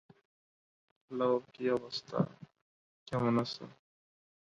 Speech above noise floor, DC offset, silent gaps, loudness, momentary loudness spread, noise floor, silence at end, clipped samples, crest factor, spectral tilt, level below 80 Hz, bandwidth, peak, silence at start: over 56 dB; under 0.1%; 2.62-3.06 s; -35 LUFS; 12 LU; under -90 dBFS; 0.75 s; under 0.1%; 20 dB; -7 dB/octave; -70 dBFS; 10.5 kHz; -18 dBFS; 1.1 s